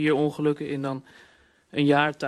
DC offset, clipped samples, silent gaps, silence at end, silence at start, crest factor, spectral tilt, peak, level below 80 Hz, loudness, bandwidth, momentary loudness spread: under 0.1%; under 0.1%; none; 0 s; 0 s; 18 dB; -7 dB/octave; -8 dBFS; -66 dBFS; -25 LUFS; 11.5 kHz; 12 LU